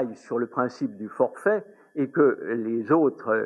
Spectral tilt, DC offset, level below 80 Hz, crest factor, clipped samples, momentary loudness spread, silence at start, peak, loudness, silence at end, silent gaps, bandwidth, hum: -8 dB/octave; under 0.1%; -86 dBFS; 18 dB; under 0.1%; 9 LU; 0 s; -8 dBFS; -25 LUFS; 0 s; none; 11 kHz; none